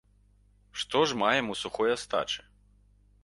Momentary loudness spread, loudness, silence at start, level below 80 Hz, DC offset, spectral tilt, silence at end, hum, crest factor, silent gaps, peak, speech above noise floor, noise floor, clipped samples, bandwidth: 11 LU; -29 LUFS; 0.75 s; -62 dBFS; under 0.1%; -3 dB/octave; 0.85 s; 50 Hz at -55 dBFS; 22 dB; none; -10 dBFS; 34 dB; -63 dBFS; under 0.1%; 11.5 kHz